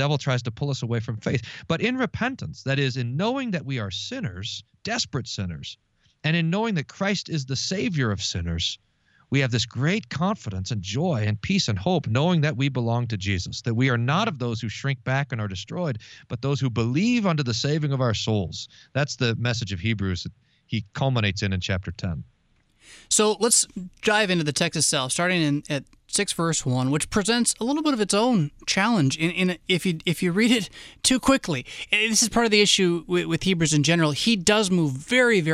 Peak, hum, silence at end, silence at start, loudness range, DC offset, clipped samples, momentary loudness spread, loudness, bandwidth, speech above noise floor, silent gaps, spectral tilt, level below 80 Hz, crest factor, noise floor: -4 dBFS; none; 0 s; 0 s; 7 LU; under 0.1%; under 0.1%; 10 LU; -24 LUFS; 15 kHz; 40 dB; none; -4 dB/octave; -50 dBFS; 20 dB; -64 dBFS